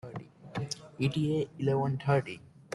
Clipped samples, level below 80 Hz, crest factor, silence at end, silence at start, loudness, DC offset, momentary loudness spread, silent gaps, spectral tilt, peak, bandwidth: under 0.1%; -64 dBFS; 18 dB; 0 s; 0.05 s; -32 LUFS; under 0.1%; 15 LU; none; -6.5 dB/octave; -14 dBFS; 11.5 kHz